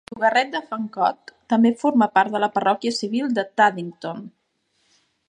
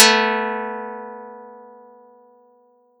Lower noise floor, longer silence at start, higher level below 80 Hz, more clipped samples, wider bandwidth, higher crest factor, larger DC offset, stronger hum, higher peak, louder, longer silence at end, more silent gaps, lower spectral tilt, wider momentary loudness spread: first, -68 dBFS vs -57 dBFS; about the same, 0.1 s vs 0 s; first, -72 dBFS vs under -90 dBFS; neither; second, 9.8 kHz vs 17.5 kHz; about the same, 18 dB vs 22 dB; neither; neither; second, -4 dBFS vs 0 dBFS; about the same, -21 LUFS vs -20 LUFS; second, 1 s vs 1.35 s; neither; first, -5 dB/octave vs -0.5 dB/octave; second, 13 LU vs 25 LU